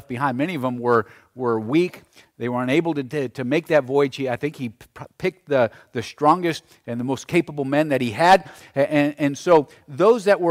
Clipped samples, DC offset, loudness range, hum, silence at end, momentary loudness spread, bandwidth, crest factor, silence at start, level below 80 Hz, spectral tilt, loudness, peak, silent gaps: under 0.1%; under 0.1%; 4 LU; none; 0 s; 14 LU; 15.5 kHz; 16 dB; 0.1 s; -60 dBFS; -6 dB/octave; -21 LUFS; -4 dBFS; none